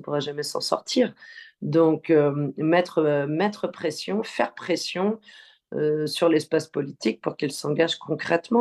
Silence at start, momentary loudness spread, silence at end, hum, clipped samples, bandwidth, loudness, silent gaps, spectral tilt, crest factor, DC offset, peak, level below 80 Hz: 0 s; 8 LU; 0 s; none; under 0.1%; 12.5 kHz; -24 LUFS; none; -5.5 dB/octave; 18 dB; under 0.1%; -6 dBFS; -72 dBFS